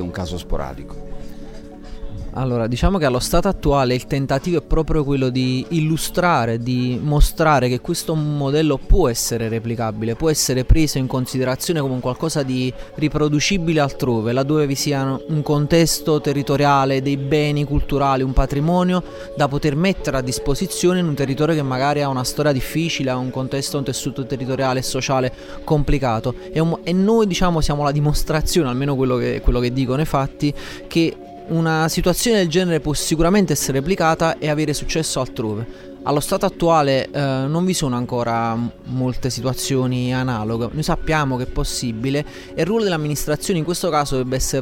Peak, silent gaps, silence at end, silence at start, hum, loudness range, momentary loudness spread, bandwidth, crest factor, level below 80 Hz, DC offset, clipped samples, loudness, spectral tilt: -2 dBFS; none; 0 s; 0 s; none; 3 LU; 7 LU; 17 kHz; 16 dB; -28 dBFS; under 0.1%; under 0.1%; -19 LUFS; -5.5 dB/octave